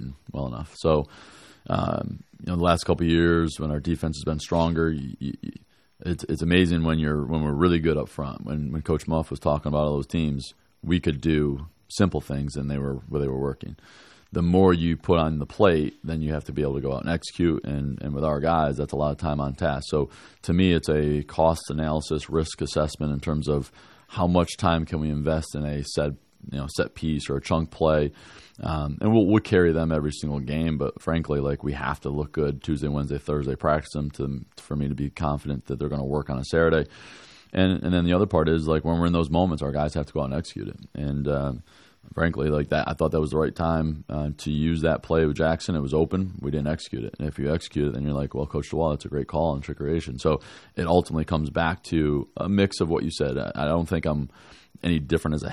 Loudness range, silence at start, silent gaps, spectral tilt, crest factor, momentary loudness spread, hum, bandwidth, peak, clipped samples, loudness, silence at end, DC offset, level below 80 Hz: 4 LU; 0 s; none; -7 dB/octave; 22 dB; 10 LU; none; 12.5 kHz; -4 dBFS; under 0.1%; -25 LUFS; 0 s; under 0.1%; -42 dBFS